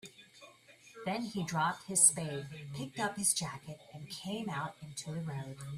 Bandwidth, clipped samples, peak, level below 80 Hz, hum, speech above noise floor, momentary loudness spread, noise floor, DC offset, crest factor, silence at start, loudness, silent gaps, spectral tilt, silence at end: 15.5 kHz; under 0.1%; -10 dBFS; -72 dBFS; none; 24 dB; 20 LU; -59 dBFS; under 0.1%; 26 dB; 0.05 s; -33 LUFS; none; -3 dB/octave; 0 s